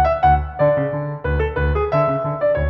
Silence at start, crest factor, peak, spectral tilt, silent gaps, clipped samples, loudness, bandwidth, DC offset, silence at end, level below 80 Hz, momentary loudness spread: 0 s; 14 dB; -4 dBFS; -10 dB/octave; none; under 0.1%; -19 LUFS; 5.8 kHz; under 0.1%; 0 s; -26 dBFS; 6 LU